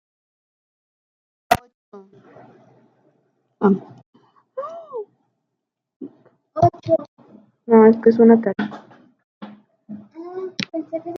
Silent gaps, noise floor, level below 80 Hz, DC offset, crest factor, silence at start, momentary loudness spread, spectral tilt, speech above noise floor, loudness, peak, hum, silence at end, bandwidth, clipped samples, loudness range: 1.74-1.92 s, 4.06-4.13 s, 5.96-6.00 s, 7.08-7.17 s, 9.24-9.41 s; -80 dBFS; -60 dBFS; under 0.1%; 20 dB; 1.5 s; 27 LU; -7.5 dB/octave; 64 dB; -17 LUFS; -2 dBFS; none; 0 s; 15.5 kHz; under 0.1%; 11 LU